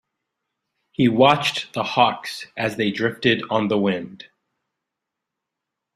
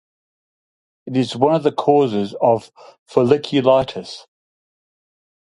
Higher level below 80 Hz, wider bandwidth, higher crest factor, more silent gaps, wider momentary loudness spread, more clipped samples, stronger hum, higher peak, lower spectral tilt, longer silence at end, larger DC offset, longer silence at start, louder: about the same, -62 dBFS vs -58 dBFS; first, 15 kHz vs 11.5 kHz; about the same, 22 dB vs 20 dB; second, none vs 2.98-3.06 s; first, 14 LU vs 11 LU; neither; neither; about the same, -2 dBFS vs 0 dBFS; second, -5.5 dB/octave vs -7 dB/octave; first, 1.7 s vs 1.3 s; neither; about the same, 1 s vs 1.05 s; about the same, -20 LUFS vs -18 LUFS